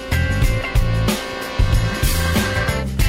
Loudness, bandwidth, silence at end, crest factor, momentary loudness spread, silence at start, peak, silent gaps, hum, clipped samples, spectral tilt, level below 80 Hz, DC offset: -19 LUFS; 16.5 kHz; 0 s; 14 dB; 3 LU; 0 s; -4 dBFS; none; none; under 0.1%; -5 dB/octave; -22 dBFS; under 0.1%